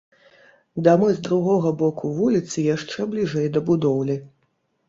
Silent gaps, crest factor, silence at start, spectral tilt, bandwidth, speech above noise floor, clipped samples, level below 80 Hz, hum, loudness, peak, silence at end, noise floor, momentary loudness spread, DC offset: none; 18 dB; 0.75 s; -7 dB/octave; 7.8 kHz; 49 dB; under 0.1%; -60 dBFS; none; -21 LUFS; -2 dBFS; 0.6 s; -69 dBFS; 8 LU; under 0.1%